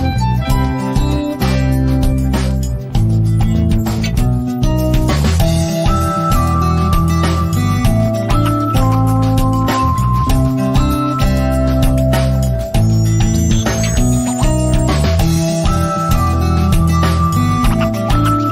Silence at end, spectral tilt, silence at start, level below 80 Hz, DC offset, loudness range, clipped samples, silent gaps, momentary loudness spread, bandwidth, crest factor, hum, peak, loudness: 0 s; -6.5 dB/octave; 0 s; -20 dBFS; under 0.1%; 1 LU; under 0.1%; none; 3 LU; 16 kHz; 10 dB; none; -2 dBFS; -14 LUFS